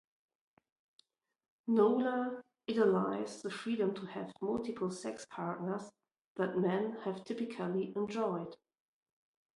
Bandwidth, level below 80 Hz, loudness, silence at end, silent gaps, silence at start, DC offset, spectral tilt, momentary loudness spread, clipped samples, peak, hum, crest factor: 11.5 kHz; -78 dBFS; -36 LUFS; 1 s; 6.21-6.35 s; 1.65 s; under 0.1%; -6.5 dB/octave; 13 LU; under 0.1%; -16 dBFS; none; 20 dB